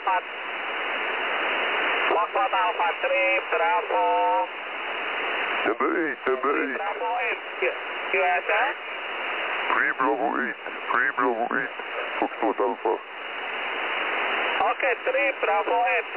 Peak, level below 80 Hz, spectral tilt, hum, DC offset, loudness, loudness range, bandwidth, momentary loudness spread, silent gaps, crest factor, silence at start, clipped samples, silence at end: -8 dBFS; -74 dBFS; -6 dB/octave; none; 0.1%; -25 LUFS; 3 LU; 4 kHz; 7 LU; none; 18 dB; 0 s; under 0.1%; 0 s